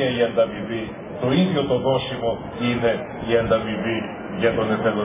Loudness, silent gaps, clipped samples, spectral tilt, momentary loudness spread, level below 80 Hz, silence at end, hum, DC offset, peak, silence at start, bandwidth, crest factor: -22 LUFS; none; under 0.1%; -10.5 dB/octave; 8 LU; -46 dBFS; 0 s; none; under 0.1%; -6 dBFS; 0 s; 3.8 kHz; 16 dB